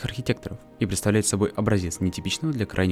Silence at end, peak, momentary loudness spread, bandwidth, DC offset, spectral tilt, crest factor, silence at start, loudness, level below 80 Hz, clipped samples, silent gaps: 0 s; -8 dBFS; 7 LU; 15.5 kHz; under 0.1%; -5 dB/octave; 16 dB; 0 s; -25 LUFS; -48 dBFS; under 0.1%; none